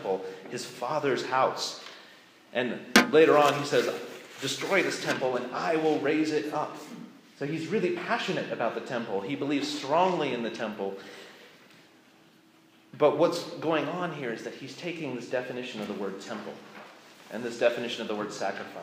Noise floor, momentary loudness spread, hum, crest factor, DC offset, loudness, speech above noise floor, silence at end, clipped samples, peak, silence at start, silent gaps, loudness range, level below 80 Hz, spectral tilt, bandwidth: -59 dBFS; 18 LU; none; 26 dB; under 0.1%; -28 LUFS; 31 dB; 0 s; under 0.1%; -2 dBFS; 0 s; none; 8 LU; -78 dBFS; -4 dB/octave; 15.5 kHz